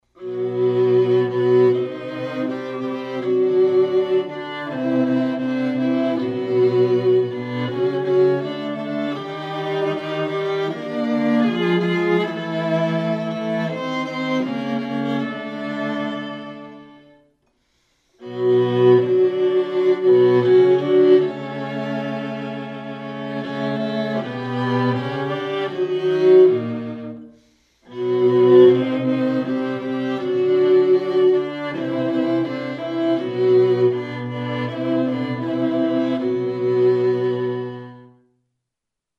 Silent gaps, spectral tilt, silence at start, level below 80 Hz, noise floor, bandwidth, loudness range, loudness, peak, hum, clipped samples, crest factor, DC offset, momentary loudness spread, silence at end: none; -8 dB/octave; 0.2 s; -68 dBFS; -83 dBFS; 6.2 kHz; 8 LU; -20 LUFS; -2 dBFS; none; under 0.1%; 16 dB; under 0.1%; 13 LU; 1.15 s